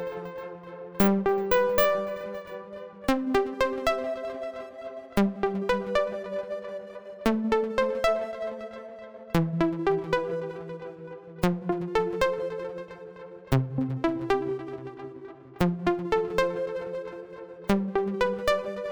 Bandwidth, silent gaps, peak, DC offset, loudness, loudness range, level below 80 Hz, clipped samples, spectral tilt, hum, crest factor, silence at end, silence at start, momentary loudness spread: over 20 kHz; none; -6 dBFS; under 0.1%; -28 LUFS; 4 LU; -48 dBFS; under 0.1%; -6.5 dB/octave; none; 22 dB; 0 s; 0 s; 16 LU